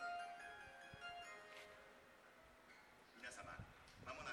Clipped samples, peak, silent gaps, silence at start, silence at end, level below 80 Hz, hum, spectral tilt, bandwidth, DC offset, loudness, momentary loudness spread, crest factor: under 0.1%; -38 dBFS; none; 0 s; 0 s; -76 dBFS; none; -3 dB/octave; 19 kHz; under 0.1%; -57 LUFS; 12 LU; 18 dB